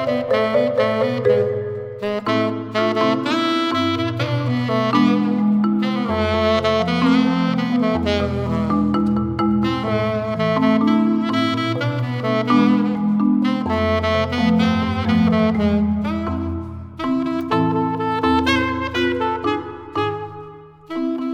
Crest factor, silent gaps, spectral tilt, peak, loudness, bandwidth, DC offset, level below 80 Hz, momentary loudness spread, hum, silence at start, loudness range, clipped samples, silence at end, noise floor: 16 dB; none; -7 dB/octave; -4 dBFS; -19 LUFS; 9.4 kHz; under 0.1%; -42 dBFS; 7 LU; none; 0 s; 3 LU; under 0.1%; 0 s; -39 dBFS